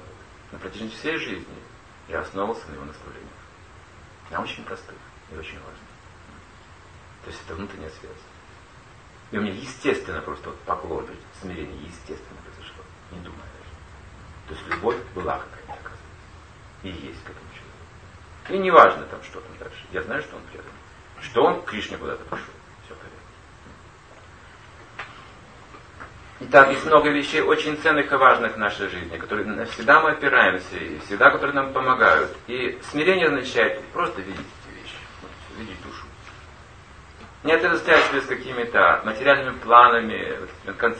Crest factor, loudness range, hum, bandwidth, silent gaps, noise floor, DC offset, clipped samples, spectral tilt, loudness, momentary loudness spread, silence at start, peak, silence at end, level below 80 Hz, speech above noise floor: 24 dB; 22 LU; none; 9.2 kHz; none; -47 dBFS; under 0.1%; under 0.1%; -4.5 dB/octave; -20 LUFS; 26 LU; 0 s; 0 dBFS; 0 s; -50 dBFS; 25 dB